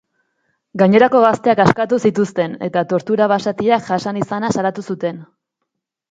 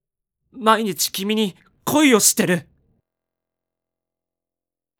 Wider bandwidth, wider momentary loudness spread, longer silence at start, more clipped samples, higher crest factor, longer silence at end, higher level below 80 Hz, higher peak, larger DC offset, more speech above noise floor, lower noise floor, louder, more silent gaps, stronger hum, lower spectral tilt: second, 9.2 kHz vs over 20 kHz; about the same, 11 LU vs 11 LU; first, 0.75 s vs 0.55 s; neither; about the same, 16 dB vs 20 dB; second, 0.85 s vs 2.35 s; first, -56 dBFS vs -66 dBFS; about the same, 0 dBFS vs -2 dBFS; neither; second, 61 dB vs over 72 dB; second, -77 dBFS vs under -90 dBFS; about the same, -16 LUFS vs -18 LUFS; neither; neither; first, -6.5 dB/octave vs -3 dB/octave